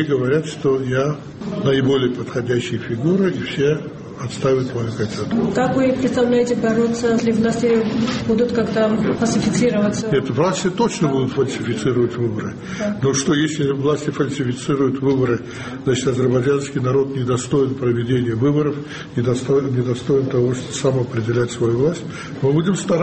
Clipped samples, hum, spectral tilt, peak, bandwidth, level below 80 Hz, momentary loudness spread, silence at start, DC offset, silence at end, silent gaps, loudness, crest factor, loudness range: under 0.1%; none; -6 dB/octave; -4 dBFS; 8.8 kHz; -48 dBFS; 6 LU; 0 s; under 0.1%; 0 s; none; -19 LUFS; 14 dB; 2 LU